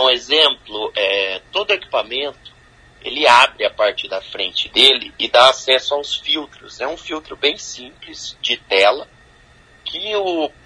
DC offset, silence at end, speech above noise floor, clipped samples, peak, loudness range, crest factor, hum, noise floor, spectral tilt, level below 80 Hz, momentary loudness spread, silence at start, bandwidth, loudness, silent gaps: under 0.1%; 0.15 s; 31 dB; under 0.1%; 0 dBFS; 7 LU; 18 dB; none; -49 dBFS; -1 dB/octave; -54 dBFS; 17 LU; 0 s; 11 kHz; -16 LUFS; none